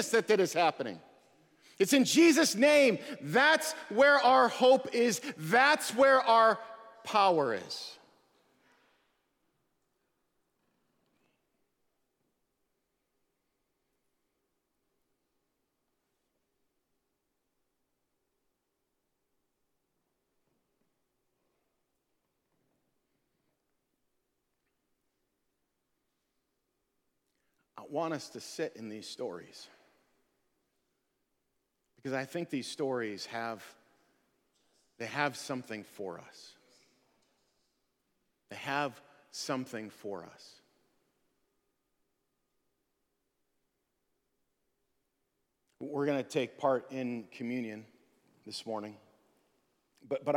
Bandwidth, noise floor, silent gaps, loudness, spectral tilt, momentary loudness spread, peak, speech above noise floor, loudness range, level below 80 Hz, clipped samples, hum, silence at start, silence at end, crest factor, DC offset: 18 kHz; -82 dBFS; none; -29 LUFS; -3.5 dB/octave; 20 LU; -10 dBFS; 53 dB; 19 LU; -84 dBFS; under 0.1%; none; 0 s; 0 s; 24 dB; under 0.1%